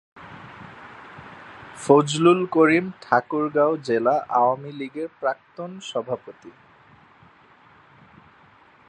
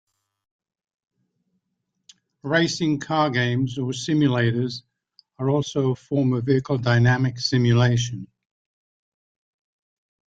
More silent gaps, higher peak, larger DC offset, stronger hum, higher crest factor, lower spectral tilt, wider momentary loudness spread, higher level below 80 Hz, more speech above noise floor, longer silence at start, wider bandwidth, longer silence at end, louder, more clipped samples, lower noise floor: neither; first, -2 dBFS vs -6 dBFS; neither; neither; about the same, 22 dB vs 18 dB; about the same, -5.5 dB/octave vs -6 dB/octave; first, 24 LU vs 9 LU; second, -66 dBFS vs -58 dBFS; second, 32 dB vs 56 dB; second, 0.15 s vs 2.45 s; first, 11.5 kHz vs 7.8 kHz; first, 2.4 s vs 2.05 s; about the same, -21 LUFS vs -22 LUFS; neither; second, -53 dBFS vs -77 dBFS